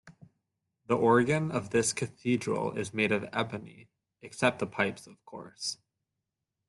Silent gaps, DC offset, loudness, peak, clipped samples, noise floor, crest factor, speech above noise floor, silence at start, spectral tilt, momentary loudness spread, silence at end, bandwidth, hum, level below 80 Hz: none; under 0.1%; -30 LUFS; -10 dBFS; under 0.1%; -86 dBFS; 22 dB; 56 dB; 0.05 s; -4.5 dB/octave; 21 LU; 0.95 s; 12 kHz; none; -68 dBFS